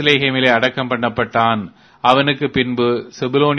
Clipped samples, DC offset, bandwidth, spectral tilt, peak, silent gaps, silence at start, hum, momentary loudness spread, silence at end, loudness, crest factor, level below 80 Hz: under 0.1%; under 0.1%; 11 kHz; -6 dB/octave; 0 dBFS; none; 0 s; none; 6 LU; 0 s; -16 LUFS; 16 dB; -52 dBFS